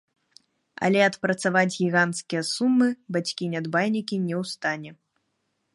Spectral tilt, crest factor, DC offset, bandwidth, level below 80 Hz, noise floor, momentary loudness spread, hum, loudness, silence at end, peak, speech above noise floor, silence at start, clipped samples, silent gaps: -5 dB/octave; 20 dB; under 0.1%; 11.5 kHz; -74 dBFS; -75 dBFS; 8 LU; none; -24 LUFS; 0.8 s; -6 dBFS; 51 dB; 0.8 s; under 0.1%; none